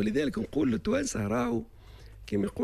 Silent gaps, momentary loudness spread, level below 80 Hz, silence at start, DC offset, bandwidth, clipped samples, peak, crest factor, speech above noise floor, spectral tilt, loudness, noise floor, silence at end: none; 7 LU; -50 dBFS; 0 s; under 0.1%; 13.5 kHz; under 0.1%; -16 dBFS; 14 dB; 20 dB; -5.5 dB/octave; -30 LUFS; -49 dBFS; 0 s